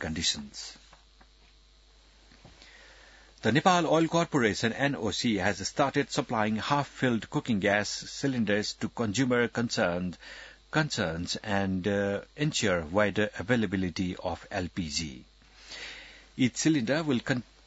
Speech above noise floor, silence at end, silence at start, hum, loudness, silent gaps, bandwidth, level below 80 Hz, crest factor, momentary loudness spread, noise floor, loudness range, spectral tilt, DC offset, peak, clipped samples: 30 dB; 0.25 s; 0 s; none; -29 LUFS; none; 8 kHz; -58 dBFS; 22 dB; 13 LU; -59 dBFS; 5 LU; -4.5 dB/octave; under 0.1%; -8 dBFS; under 0.1%